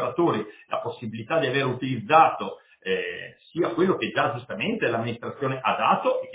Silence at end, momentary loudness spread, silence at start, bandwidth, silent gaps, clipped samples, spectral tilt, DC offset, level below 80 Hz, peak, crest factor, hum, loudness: 0 s; 13 LU; 0 s; 4 kHz; none; under 0.1%; -9.5 dB/octave; under 0.1%; -66 dBFS; -4 dBFS; 22 dB; none; -25 LUFS